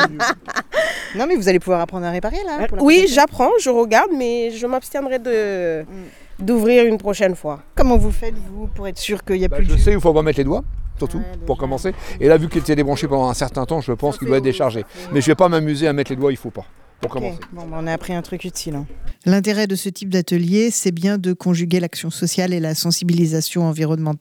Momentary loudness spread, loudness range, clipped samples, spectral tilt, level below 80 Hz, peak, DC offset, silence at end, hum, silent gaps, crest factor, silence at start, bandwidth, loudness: 13 LU; 5 LU; under 0.1%; -5.5 dB/octave; -28 dBFS; 0 dBFS; under 0.1%; 0.05 s; none; none; 18 dB; 0 s; 18.5 kHz; -18 LUFS